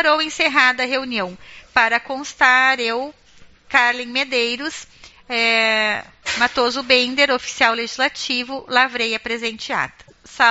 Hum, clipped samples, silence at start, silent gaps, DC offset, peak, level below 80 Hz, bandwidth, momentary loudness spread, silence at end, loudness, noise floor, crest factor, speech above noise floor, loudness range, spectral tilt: none; under 0.1%; 0 s; none; under 0.1%; 0 dBFS; -56 dBFS; 8 kHz; 11 LU; 0 s; -18 LUFS; -47 dBFS; 20 dB; 28 dB; 2 LU; 1.5 dB/octave